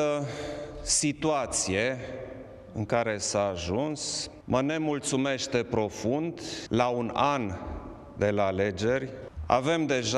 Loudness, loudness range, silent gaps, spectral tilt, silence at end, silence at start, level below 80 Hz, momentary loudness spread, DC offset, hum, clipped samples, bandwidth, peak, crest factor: -28 LUFS; 1 LU; none; -4 dB/octave; 0 s; 0 s; -50 dBFS; 12 LU; under 0.1%; none; under 0.1%; 13 kHz; -8 dBFS; 22 dB